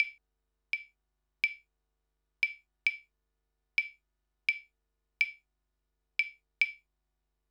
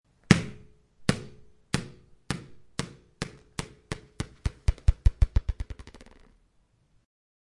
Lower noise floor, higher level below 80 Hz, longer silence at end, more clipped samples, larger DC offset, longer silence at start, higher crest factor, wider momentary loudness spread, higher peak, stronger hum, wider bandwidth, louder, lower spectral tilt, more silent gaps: first, -82 dBFS vs -67 dBFS; second, -82 dBFS vs -34 dBFS; second, 0.75 s vs 1.65 s; neither; neither; second, 0 s vs 0.3 s; about the same, 26 dB vs 30 dB; second, 8 LU vs 18 LU; second, -12 dBFS vs 0 dBFS; neither; first, 17.5 kHz vs 11.5 kHz; about the same, -33 LUFS vs -31 LUFS; second, 3 dB/octave vs -5.5 dB/octave; neither